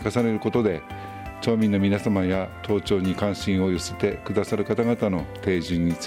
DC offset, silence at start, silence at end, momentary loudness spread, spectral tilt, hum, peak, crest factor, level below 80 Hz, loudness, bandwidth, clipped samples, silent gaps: under 0.1%; 0 s; 0 s; 6 LU; -6.5 dB/octave; none; -8 dBFS; 16 dB; -48 dBFS; -24 LUFS; 15.5 kHz; under 0.1%; none